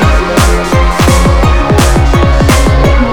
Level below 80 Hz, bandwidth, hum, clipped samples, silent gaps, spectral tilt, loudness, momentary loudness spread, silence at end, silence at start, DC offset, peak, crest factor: -10 dBFS; 19 kHz; none; 0.7%; none; -5.5 dB/octave; -8 LUFS; 1 LU; 0 s; 0 s; 5%; 0 dBFS; 6 dB